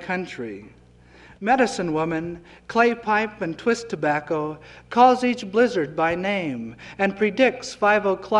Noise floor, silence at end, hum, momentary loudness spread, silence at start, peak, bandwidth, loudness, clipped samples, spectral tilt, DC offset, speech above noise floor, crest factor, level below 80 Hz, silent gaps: -50 dBFS; 0 s; none; 14 LU; 0 s; -4 dBFS; 11 kHz; -22 LUFS; under 0.1%; -5 dB/octave; under 0.1%; 28 dB; 18 dB; -56 dBFS; none